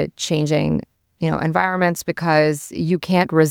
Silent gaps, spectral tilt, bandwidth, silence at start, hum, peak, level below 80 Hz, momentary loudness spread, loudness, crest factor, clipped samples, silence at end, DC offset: none; -5.5 dB/octave; 18 kHz; 0 s; none; -2 dBFS; -50 dBFS; 6 LU; -19 LUFS; 16 dB; under 0.1%; 0 s; under 0.1%